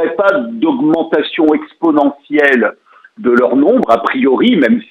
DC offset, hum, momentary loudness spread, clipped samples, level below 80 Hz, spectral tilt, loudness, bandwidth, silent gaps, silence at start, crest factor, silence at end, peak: under 0.1%; none; 5 LU; under 0.1%; -58 dBFS; -7 dB/octave; -12 LUFS; 7 kHz; none; 0 s; 12 dB; 0.05 s; 0 dBFS